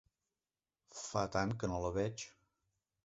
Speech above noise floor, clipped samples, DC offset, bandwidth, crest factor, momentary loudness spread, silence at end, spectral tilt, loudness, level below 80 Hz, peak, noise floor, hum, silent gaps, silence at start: over 52 dB; under 0.1%; under 0.1%; 8 kHz; 22 dB; 13 LU; 0.75 s; -5.5 dB/octave; -39 LUFS; -58 dBFS; -18 dBFS; under -90 dBFS; none; none; 0.9 s